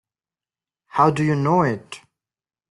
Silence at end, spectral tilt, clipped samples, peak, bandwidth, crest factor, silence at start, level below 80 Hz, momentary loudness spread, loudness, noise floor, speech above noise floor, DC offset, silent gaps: 0.75 s; -7.5 dB/octave; under 0.1%; -4 dBFS; 11.5 kHz; 20 dB; 0.95 s; -60 dBFS; 19 LU; -20 LUFS; under -90 dBFS; over 71 dB; under 0.1%; none